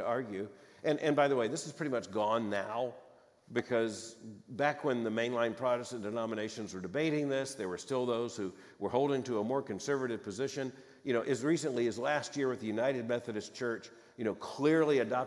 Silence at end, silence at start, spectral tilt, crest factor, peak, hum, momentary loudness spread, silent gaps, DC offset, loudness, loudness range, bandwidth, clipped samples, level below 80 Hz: 0 s; 0 s; -5 dB/octave; 20 dB; -14 dBFS; none; 11 LU; none; under 0.1%; -34 LUFS; 2 LU; 12 kHz; under 0.1%; -82 dBFS